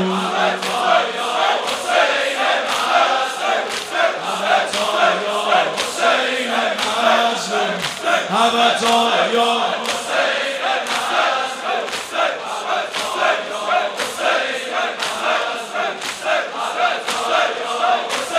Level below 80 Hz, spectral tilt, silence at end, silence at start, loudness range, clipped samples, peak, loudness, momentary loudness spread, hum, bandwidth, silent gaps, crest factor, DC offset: -68 dBFS; -2 dB/octave; 0 s; 0 s; 3 LU; under 0.1%; 0 dBFS; -18 LUFS; 6 LU; none; 16 kHz; none; 18 dB; under 0.1%